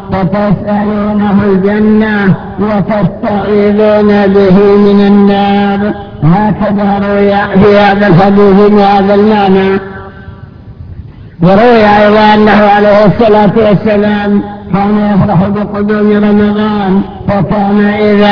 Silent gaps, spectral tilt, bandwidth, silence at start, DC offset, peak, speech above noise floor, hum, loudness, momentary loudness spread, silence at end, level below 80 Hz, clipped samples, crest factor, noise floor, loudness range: none; -9 dB/octave; 5.4 kHz; 0 s; under 0.1%; 0 dBFS; 22 dB; none; -7 LUFS; 8 LU; 0 s; -32 dBFS; 3%; 6 dB; -28 dBFS; 3 LU